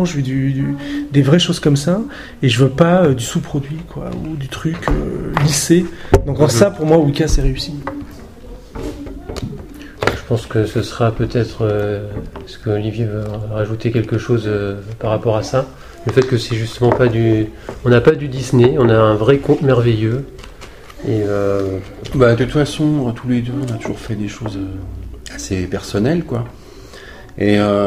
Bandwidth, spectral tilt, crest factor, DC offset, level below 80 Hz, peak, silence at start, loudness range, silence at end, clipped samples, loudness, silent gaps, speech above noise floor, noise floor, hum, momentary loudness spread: 15.5 kHz; -6 dB/octave; 16 dB; under 0.1%; -30 dBFS; 0 dBFS; 0 s; 8 LU; 0 s; under 0.1%; -16 LUFS; none; 20 dB; -36 dBFS; none; 17 LU